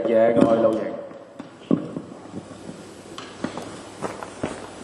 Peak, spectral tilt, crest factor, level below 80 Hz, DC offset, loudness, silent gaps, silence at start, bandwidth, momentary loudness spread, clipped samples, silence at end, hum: -2 dBFS; -6.5 dB/octave; 24 dB; -60 dBFS; under 0.1%; -23 LUFS; none; 0 s; 11.5 kHz; 22 LU; under 0.1%; 0 s; none